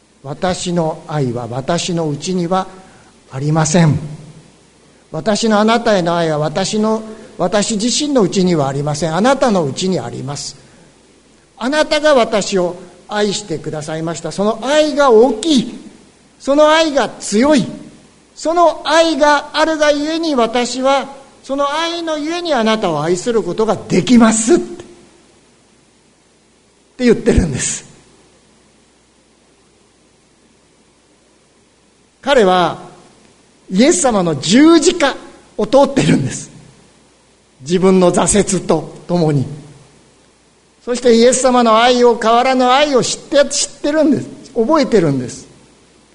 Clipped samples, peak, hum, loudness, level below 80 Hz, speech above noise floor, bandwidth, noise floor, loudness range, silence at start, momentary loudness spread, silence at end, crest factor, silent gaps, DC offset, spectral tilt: under 0.1%; 0 dBFS; none; -14 LUFS; -40 dBFS; 39 dB; 11 kHz; -52 dBFS; 6 LU; 0.25 s; 13 LU; 0.7 s; 16 dB; none; under 0.1%; -4.5 dB/octave